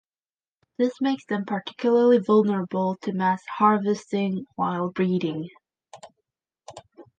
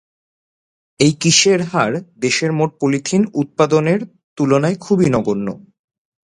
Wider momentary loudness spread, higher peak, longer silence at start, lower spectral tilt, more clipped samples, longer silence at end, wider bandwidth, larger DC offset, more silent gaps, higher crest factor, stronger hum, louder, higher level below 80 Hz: about the same, 10 LU vs 10 LU; second, -6 dBFS vs 0 dBFS; second, 0.8 s vs 1 s; first, -7.5 dB/octave vs -4.5 dB/octave; neither; second, 0.15 s vs 0.8 s; second, 9 kHz vs 11 kHz; neither; second, none vs 4.24-4.36 s; about the same, 18 dB vs 18 dB; neither; second, -24 LUFS vs -16 LUFS; second, -72 dBFS vs -54 dBFS